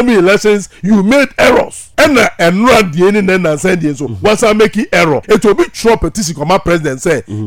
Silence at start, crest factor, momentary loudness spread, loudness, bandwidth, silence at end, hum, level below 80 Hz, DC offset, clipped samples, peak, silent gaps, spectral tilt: 0 s; 10 dB; 6 LU; -10 LUFS; 17 kHz; 0 s; none; -32 dBFS; under 0.1%; under 0.1%; 0 dBFS; none; -5 dB/octave